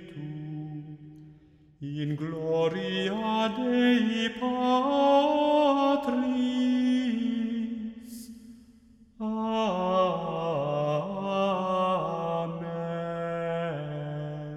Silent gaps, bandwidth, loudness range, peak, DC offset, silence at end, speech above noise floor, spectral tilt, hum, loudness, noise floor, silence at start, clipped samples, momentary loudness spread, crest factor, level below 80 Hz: none; 12.5 kHz; 6 LU; -12 dBFS; under 0.1%; 0 s; 30 dB; -6.5 dB/octave; none; -28 LUFS; -56 dBFS; 0 s; under 0.1%; 15 LU; 16 dB; -62 dBFS